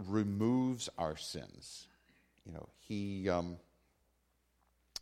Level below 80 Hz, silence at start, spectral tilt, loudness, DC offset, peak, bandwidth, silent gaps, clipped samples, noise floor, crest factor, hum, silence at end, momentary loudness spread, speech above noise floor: -66 dBFS; 0 s; -5.5 dB/octave; -37 LUFS; under 0.1%; -20 dBFS; 14.5 kHz; none; under 0.1%; -77 dBFS; 20 dB; none; 0 s; 19 LU; 40 dB